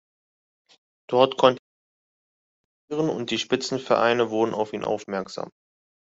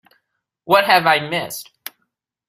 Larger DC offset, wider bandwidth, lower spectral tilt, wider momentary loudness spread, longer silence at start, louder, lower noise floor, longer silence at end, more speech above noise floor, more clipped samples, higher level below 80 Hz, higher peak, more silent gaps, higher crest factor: neither; second, 8 kHz vs 16 kHz; about the same, -4.5 dB/octave vs -3.5 dB/octave; second, 14 LU vs 22 LU; first, 1.1 s vs 0.65 s; second, -24 LUFS vs -16 LUFS; first, under -90 dBFS vs -74 dBFS; second, 0.6 s vs 0.85 s; first, over 67 dB vs 57 dB; neither; about the same, -68 dBFS vs -64 dBFS; about the same, -2 dBFS vs 0 dBFS; first, 1.59-2.88 s vs none; about the same, 24 dB vs 20 dB